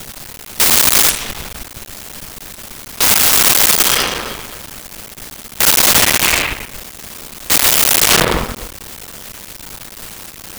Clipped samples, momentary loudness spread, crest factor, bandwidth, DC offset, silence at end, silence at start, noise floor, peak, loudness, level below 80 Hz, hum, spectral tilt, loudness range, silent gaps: under 0.1%; 22 LU; 16 dB; over 20 kHz; 0.2%; 0 s; 0 s; -33 dBFS; 0 dBFS; -10 LUFS; -36 dBFS; none; -0.5 dB/octave; 3 LU; none